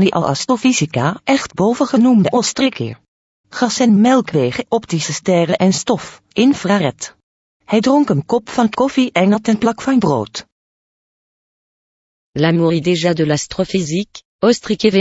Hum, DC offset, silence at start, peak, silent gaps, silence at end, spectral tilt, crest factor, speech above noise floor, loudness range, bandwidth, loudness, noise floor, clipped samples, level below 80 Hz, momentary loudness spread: none; under 0.1%; 0 s; 0 dBFS; 3.08-3.44 s, 7.23-7.60 s, 10.52-12.33 s, 14.25-14.39 s; 0 s; -5.5 dB/octave; 16 dB; over 75 dB; 4 LU; 8 kHz; -15 LUFS; under -90 dBFS; under 0.1%; -52 dBFS; 8 LU